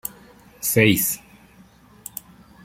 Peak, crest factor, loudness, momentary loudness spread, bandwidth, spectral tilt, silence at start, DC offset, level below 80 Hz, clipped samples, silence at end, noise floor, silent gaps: -2 dBFS; 24 dB; -19 LUFS; 20 LU; 16.5 kHz; -4 dB/octave; 0.05 s; under 0.1%; -56 dBFS; under 0.1%; 1.5 s; -51 dBFS; none